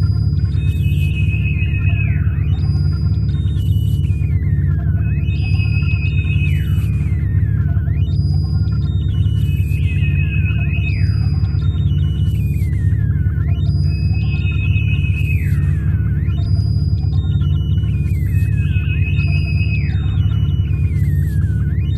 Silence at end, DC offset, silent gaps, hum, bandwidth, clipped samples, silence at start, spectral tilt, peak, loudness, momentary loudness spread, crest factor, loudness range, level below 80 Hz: 0 s; 0.4%; none; none; 12.5 kHz; under 0.1%; 0 s; -8.5 dB/octave; -4 dBFS; -17 LUFS; 1 LU; 12 dB; 0 LU; -22 dBFS